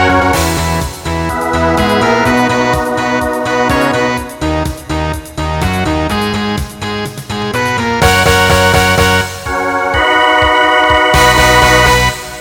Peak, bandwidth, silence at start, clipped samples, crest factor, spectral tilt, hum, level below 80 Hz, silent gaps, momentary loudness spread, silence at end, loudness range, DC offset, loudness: 0 dBFS; 19 kHz; 0 s; 0.1%; 12 dB; -4 dB/octave; none; -24 dBFS; none; 11 LU; 0 s; 7 LU; under 0.1%; -11 LUFS